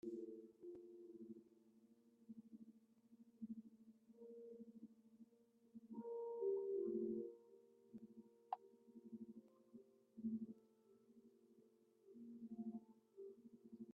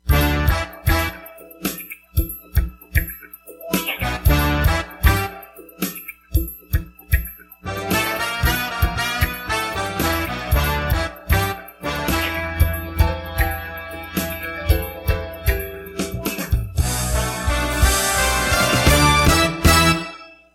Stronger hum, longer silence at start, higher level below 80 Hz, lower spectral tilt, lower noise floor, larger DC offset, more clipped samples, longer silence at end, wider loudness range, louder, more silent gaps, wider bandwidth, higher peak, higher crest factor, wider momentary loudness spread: neither; about the same, 0.05 s vs 0.05 s; second, under -90 dBFS vs -24 dBFS; first, -8 dB/octave vs -4 dB/octave; first, -75 dBFS vs -40 dBFS; neither; neither; second, 0 s vs 0.2 s; first, 12 LU vs 8 LU; second, -52 LUFS vs -20 LUFS; neither; second, 2.8 kHz vs 17 kHz; second, -30 dBFS vs 0 dBFS; about the same, 22 dB vs 20 dB; first, 22 LU vs 13 LU